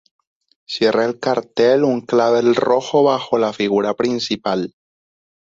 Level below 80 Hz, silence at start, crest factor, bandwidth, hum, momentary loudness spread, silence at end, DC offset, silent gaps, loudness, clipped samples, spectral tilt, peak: -60 dBFS; 0.7 s; 16 dB; 7.8 kHz; none; 6 LU; 0.8 s; under 0.1%; none; -17 LUFS; under 0.1%; -5 dB/octave; -2 dBFS